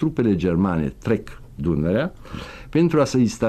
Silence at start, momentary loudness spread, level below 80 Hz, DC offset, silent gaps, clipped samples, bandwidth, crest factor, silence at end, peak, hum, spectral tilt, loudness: 0 s; 17 LU; -40 dBFS; under 0.1%; none; under 0.1%; 13 kHz; 14 dB; 0 s; -8 dBFS; none; -7 dB/octave; -21 LUFS